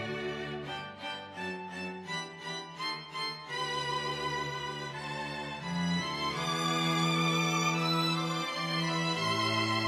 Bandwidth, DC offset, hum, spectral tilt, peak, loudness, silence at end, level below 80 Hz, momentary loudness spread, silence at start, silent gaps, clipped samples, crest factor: 15 kHz; under 0.1%; none; -4 dB/octave; -18 dBFS; -32 LUFS; 0 s; -64 dBFS; 11 LU; 0 s; none; under 0.1%; 16 dB